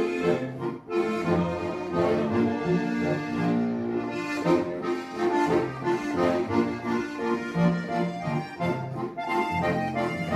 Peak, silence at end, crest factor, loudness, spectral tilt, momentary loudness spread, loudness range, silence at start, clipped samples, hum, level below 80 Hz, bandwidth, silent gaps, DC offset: -10 dBFS; 0 s; 16 dB; -27 LUFS; -7 dB/octave; 5 LU; 1 LU; 0 s; under 0.1%; none; -60 dBFS; 13.5 kHz; none; under 0.1%